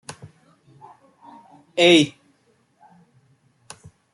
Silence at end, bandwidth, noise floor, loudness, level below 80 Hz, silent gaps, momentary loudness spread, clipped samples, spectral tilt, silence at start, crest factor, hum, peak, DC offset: 2.05 s; 12 kHz; -63 dBFS; -17 LUFS; -70 dBFS; none; 30 LU; under 0.1%; -4 dB/octave; 0.1 s; 22 dB; none; -4 dBFS; under 0.1%